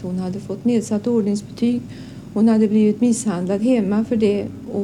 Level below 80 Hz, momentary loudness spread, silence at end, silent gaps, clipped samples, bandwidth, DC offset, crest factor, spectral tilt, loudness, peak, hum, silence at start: -52 dBFS; 11 LU; 0 s; none; under 0.1%; 12 kHz; under 0.1%; 12 dB; -6.5 dB/octave; -19 LUFS; -6 dBFS; none; 0 s